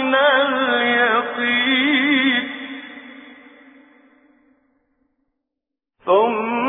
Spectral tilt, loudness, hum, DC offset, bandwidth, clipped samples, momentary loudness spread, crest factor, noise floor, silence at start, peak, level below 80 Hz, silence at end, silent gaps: -6.5 dB/octave; -17 LUFS; none; under 0.1%; 3.9 kHz; under 0.1%; 17 LU; 18 dB; -84 dBFS; 0 s; -4 dBFS; -68 dBFS; 0 s; none